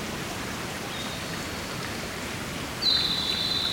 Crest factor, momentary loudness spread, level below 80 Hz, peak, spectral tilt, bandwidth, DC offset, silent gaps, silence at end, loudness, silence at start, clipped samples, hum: 18 dB; 10 LU; -48 dBFS; -12 dBFS; -2.5 dB/octave; 17.5 kHz; under 0.1%; none; 0 s; -28 LUFS; 0 s; under 0.1%; none